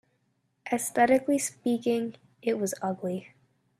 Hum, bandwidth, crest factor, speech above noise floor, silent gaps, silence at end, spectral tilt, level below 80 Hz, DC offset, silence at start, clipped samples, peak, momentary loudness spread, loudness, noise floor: none; 14.5 kHz; 18 dB; 46 dB; none; 0.55 s; -4.5 dB/octave; -74 dBFS; under 0.1%; 0.65 s; under 0.1%; -10 dBFS; 12 LU; -28 LUFS; -74 dBFS